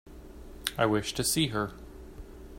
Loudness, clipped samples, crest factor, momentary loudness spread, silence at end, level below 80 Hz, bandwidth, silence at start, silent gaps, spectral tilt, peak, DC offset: -29 LUFS; under 0.1%; 26 dB; 22 LU; 0 s; -48 dBFS; 16 kHz; 0.05 s; none; -3.5 dB/octave; -6 dBFS; under 0.1%